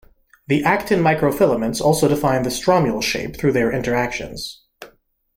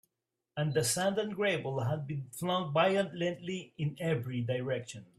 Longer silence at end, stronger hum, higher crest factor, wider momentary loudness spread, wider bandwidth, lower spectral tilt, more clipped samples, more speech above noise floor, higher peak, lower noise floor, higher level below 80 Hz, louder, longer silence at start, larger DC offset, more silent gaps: first, 0.5 s vs 0.15 s; neither; about the same, 16 dB vs 20 dB; about the same, 7 LU vs 9 LU; about the same, 16.5 kHz vs 15 kHz; about the same, -5 dB/octave vs -5 dB/octave; neither; second, 37 dB vs 54 dB; first, -4 dBFS vs -14 dBFS; second, -55 dBFS vs -87 dBFS; first, -44 dBFS vs -70 dBFS; first, -18 LUFS vs -33 LUFS; about the same, 0.5 s vs 0.55 s; neither; neither